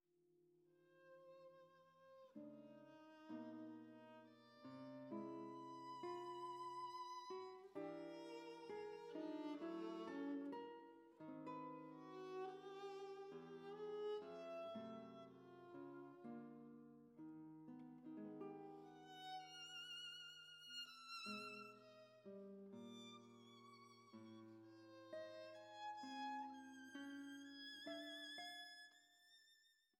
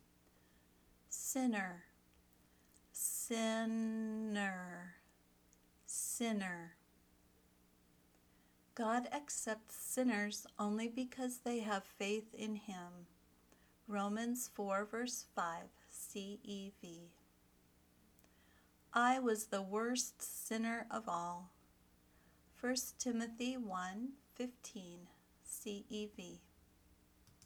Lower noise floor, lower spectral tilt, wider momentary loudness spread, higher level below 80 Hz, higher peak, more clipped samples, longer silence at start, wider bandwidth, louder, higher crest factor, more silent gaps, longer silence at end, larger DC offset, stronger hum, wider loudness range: first, -79 dBFS vs -71 dBFS; about the same, -4.5 dB/octave vs -3.5 dB/octave; about the same, 14 LU vs 16 LU; second, under -90 dBFS vs -76 dBFS; second, -40 dBFS vs -22 dBFS; neither; second, 0.25 s vs 1.1 s; second, 15.5 kHz vs over 20 kHz; second, -55 LUFS vs -42 LUFS; second, 16 dB vs 22 dB; neither; about the same, 0.25 s vs 0.15 s; neither; second, none vs 60 Hz at -75 dBFS; about the same, 8 LU vs 6 LU